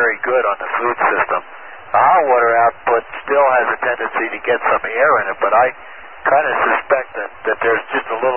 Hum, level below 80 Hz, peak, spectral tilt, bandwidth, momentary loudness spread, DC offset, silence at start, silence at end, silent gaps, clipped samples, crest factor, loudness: none; -56 dBFS; -2 dBFS; -9 dB/octave; 3.5 kHz; 9 LU; 0.8%; 0 s; 0 s; none; under 0.1%; 14 dB; -16 LUFS